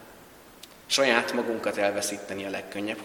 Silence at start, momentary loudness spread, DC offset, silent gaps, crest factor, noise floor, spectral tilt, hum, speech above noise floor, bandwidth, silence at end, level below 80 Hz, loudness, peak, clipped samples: 0 s; 21 LU; under 0.1%; none; 24 dB; -50 dBFS; -2 dB/octave; none; 23 dB; 19 kHz; 0 s; -68 dBFS; -27 LUFS; -4 dBFS; under 0.1%